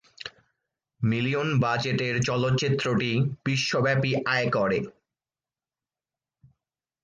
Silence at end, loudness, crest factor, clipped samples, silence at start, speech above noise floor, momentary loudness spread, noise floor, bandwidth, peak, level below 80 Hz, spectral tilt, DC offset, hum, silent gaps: 2.15 s; -25 LUFS; 16 dB; under 0.1%; 0.25 s; over 65 dB; 6 LU; under -90 dBFS; 9 kHz; -12 dBFS; -60 dBFS; -5.5 dB/octave; under 0.1%; none; none